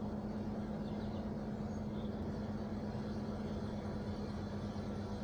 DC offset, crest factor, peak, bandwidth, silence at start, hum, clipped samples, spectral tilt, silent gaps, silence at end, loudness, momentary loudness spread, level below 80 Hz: under 0.1%; 12 dB; -30 dBFS; 9.8 kHz; 0 s; none; under 0.1%; -8 dB/octave; none; 0 s; -42 LUFS; 1 LU; -52 dBFS